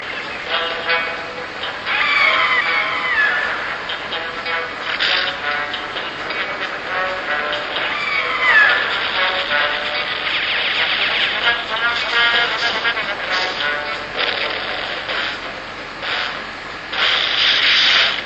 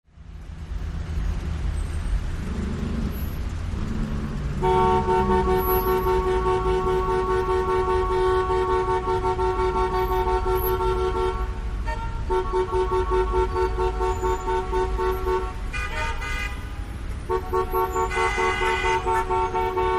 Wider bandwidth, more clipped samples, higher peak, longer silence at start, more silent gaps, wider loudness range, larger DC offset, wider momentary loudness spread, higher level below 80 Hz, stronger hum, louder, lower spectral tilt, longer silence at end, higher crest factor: second, 8.6 kHz vs 14.5 kHz; neither; first, 0 dBFS vs -8 dBFS; second, 0 s vs 0.15 s; neither; about the same, 5 LU vs 7 LU; neither; about the same, 11 LU vs 9 LU; second, -50 dBFS vs -30 dBFS; neither; first, -17 LUFS vs -24 LUFS; second, -1.5 dB/octave vs -6.5 dB/octave; about the same, 0 s vs 0 s; about the same, 18 dB vs 16 dB